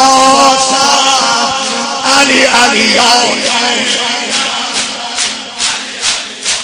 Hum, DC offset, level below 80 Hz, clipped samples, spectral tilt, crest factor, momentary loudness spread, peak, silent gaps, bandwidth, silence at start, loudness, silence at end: none; under 0.1%; -48 dBFS; 0.5%; -0.5 dB/octave; 10 dB; 8 LU; 0 dBFS; none; over 20 kHz; 0 s; -9 LUFS; 0 s